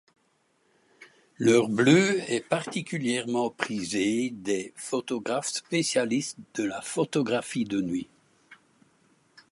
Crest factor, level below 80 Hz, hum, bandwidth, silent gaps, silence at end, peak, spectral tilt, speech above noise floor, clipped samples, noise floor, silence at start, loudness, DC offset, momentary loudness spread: 24 dB; -68 dBFS; none; 11.5 kHz; none; 1 s; -4 dBFS; -4.5 dB/octave; 43 dB; under 0.1%; -69 dBFS; 1 s; -27 LUFS; under 0.1%; 11 LU